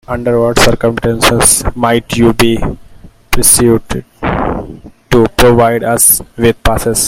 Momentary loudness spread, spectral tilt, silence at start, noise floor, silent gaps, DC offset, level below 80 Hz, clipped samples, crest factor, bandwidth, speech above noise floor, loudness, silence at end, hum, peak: 12 LU; -3.5 dB/octave; 0.1 s; -30 dBFS; none; under 0.1%; -24 dBFS; 0.5%; 10 dB; over 20 kHz; 20 dB; -10 LUFS; 0 s; none; 0 dBFS